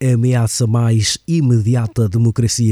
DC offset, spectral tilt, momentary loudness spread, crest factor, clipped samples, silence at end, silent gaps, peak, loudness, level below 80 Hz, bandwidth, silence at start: under 0.1%; -5.5 dB/octave; 2 LU; 12 dB; under 0.1%; 0 s; none; -4 dBFS; -15 LUFS; -46 dBFS; 13.5 kHz; 0 s